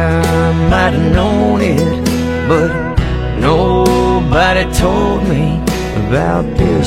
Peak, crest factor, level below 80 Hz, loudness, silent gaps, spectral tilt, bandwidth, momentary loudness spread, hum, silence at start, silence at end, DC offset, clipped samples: 0 dBFS; 12 dB; -22 dBFS; -13 LUFS; none; -6.5 dB/octave; 16 kHz; 5 LU; none; 0 s; 0 s; under 0.1%; under 0.1%